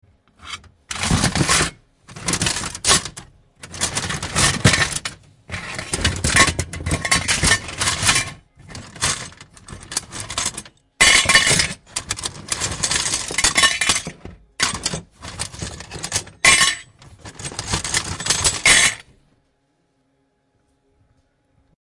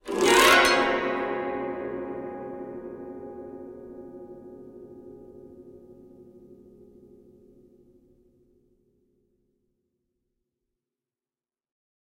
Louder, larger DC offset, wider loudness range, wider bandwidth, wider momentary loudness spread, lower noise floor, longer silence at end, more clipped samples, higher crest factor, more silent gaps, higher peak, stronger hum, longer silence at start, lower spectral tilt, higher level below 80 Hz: first, -17 LUFS vs -23 LUFS; neither; second, 4 LU vs 28 LU; second, 11.5 kHz vs 16 kHz; second, 20 LU vs 29 LU; second, -66 dBFS vs under -90 dBFS; second, 2.8 s vs 5.5 s; neither; about the same, 22 dB vs 26 dB; neither; first, 0 dBFS vs -4 dBFS; neither; first, 0.45 s vs 0.05 s; about the same, -1.5 dB/octave vs -2 dB/octave; first, -38 dBFS vs -58 dBFS